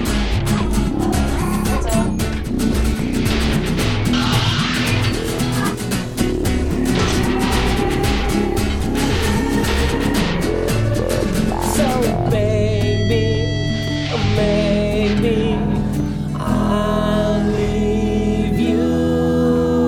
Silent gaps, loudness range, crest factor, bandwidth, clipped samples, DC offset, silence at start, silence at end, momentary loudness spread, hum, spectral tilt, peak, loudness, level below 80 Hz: none; 1 LU; 14 dB; 18 kHz; under 0.1%; under 0.1%; 0 s; 0 s; 4 LU; none; -5.5 dB/octave; -2 dBFS; -18 LUFS; -26 dBFS